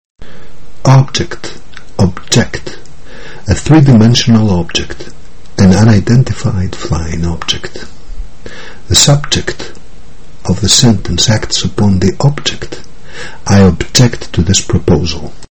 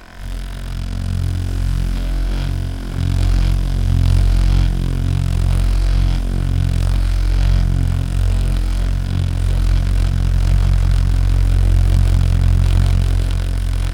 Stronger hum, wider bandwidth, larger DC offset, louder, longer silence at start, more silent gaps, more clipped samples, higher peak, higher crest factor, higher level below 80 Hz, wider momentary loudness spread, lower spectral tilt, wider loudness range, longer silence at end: neither; first, over 20 kHz vs 11.5 kHz; first, 10% vs under 0.1%; first, -10 LUFS vs -18 LUFS; first, 0.15 s vs 0 s; neither; first, 0.7% vs under 0.1%; about the same, 0 dBFS vs -2 dBFS; about the same, 12 dB vs 12 dB; second, -28 dBFS vs -16 dBFS; first, 21 LU vs 7 LU; second, -4.5 dB/octave vs -6.5 dB/octave; about the same, 4 LU vs 4 LU; about the same, 0 s vs 0 s